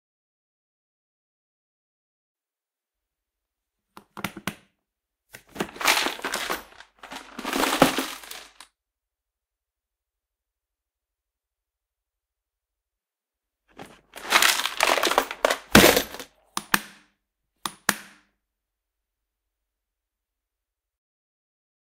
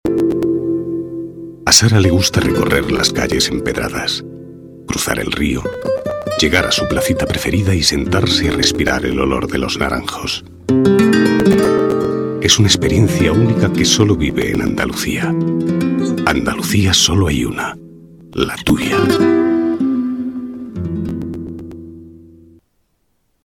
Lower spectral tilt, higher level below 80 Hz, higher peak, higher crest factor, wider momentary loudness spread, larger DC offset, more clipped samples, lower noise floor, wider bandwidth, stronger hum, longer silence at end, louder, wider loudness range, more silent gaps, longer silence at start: second, -2.5 dB/octave vs -4.5 dB/octave; second, -54 dBFS vs -34 dBFS; about the same, 0 dBFS vs 0 dBFS; first, 30 dB vs 16 dB; first, 21 LU vs 12 LU; neither; neither; first, under -90 dBFS vs -63 dBFS; second, 16 kHz vs 19 kHz; neither; first, 3.95 s vs 1.25 s; second, -22 LUFS vs -15 LUFS; first, 21 LU vs 5 LU; neither; first, 4.15 s vs 0.05 s